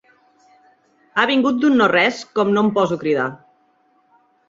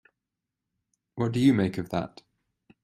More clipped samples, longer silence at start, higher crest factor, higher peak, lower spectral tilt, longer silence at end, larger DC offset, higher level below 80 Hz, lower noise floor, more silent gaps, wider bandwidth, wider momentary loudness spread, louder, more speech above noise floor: neither; about the same, 1.15 s vs 1.15 s; about the same, 18 dB vs 20 dB; first, -2 dBFS vs -10 dBFS; second, -5.5 dB/octave vs -7.5 dB/octave; first, 1.15 s vs 0.75 s; neither; about the same, -64 dBFS vs -62 dBFS; second, -60 dBFS vs -86 dBFS; neither; second, 7.8 kHz vs 13 kHz; second, 7 LU vs 17 LU; first, -17 LUFS vs -26 LUFS; second, 43 dB vs 61 dB